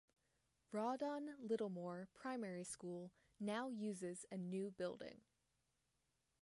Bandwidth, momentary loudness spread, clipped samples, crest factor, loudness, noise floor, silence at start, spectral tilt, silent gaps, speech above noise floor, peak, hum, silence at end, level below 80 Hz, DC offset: 11.5 kHz; 9 LU; under 0.1%; 16 dB; -48 LUFS; -87 dBFS; 0.7 s; -5.5 dB/octave; none; 40 dB; -32 dBFS; none; 1.25 s; -86 dBFS; under 0.1%